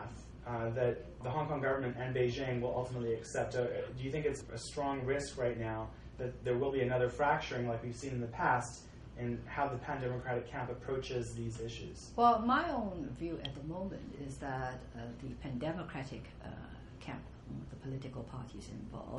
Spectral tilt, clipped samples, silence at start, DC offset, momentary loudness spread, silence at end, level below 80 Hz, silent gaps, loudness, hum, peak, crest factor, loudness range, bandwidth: -6 dB/octave; under 0.1%; 0 s; under 0.1%; 14 LU; 0 s; -54 dBFS; none; -38 LUFS; none; -16 dBFS; 22 dB; 8 LU; 11 kHz